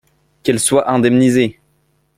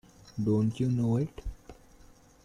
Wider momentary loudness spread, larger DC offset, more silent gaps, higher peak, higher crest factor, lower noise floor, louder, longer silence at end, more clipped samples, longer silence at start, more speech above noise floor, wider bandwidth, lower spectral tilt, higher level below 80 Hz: second, 8 LU vs 17 LU; neither; neither; first, -2 dBFS vs -16 dBFS; about the same, 14 dB vs 14 dB; first, -60 dBFS vs -56 dBFS; first, -14 LUFS vs -30 LUFS; about the same, 0.65 s vs 0.7 s; neither; first, 0.45 s vs 0.25 s; first, 47 dB vs 28 dB; first, 15 kHz vs 11 kHz; second, -5 dB/octave vs -9 dB/octave; about the same, -52 dBFS vs -50 dBFS